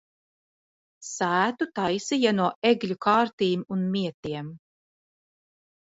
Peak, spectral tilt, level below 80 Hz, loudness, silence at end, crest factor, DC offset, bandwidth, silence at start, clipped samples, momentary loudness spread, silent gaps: -8 dBFS; -5 dB/octave; -68 dBFS; -25 LUFS; 1.35 s; 20 dB; under 0.1%; 8 kHz; 1 s; under 0.1%; 12 LU; 2.55-2.62 s, 3.33-3.38 s, 4.14-4.23 s